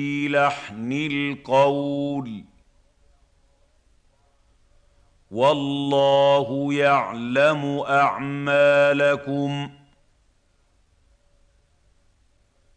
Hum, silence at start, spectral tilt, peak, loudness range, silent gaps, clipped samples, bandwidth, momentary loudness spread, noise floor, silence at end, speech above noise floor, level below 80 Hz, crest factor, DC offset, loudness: none; 0 s; -6 dB/octave; -6 dBFS; 12 LU; none; under 0.1%; 9 kHz; 11 LU; -62 dBFS; 3.05 s; 42 dB; -62 dBFS; 18 dB; under 0.1%; -21 LUFS